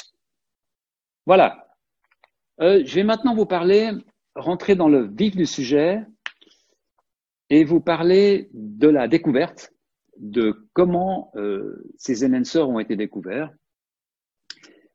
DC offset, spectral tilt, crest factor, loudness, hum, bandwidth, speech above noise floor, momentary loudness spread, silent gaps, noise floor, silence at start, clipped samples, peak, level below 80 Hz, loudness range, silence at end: under 0.1%; -6.5 dB/octave; 18 dB; -20 LUFS; none; 7.6 kHz; over 71 dB; 15 LU; none; under -90 dBFS; 1.25 s; under 0.1%; -2 dBFS; -60 dBFS; 5 LU; 1.45 s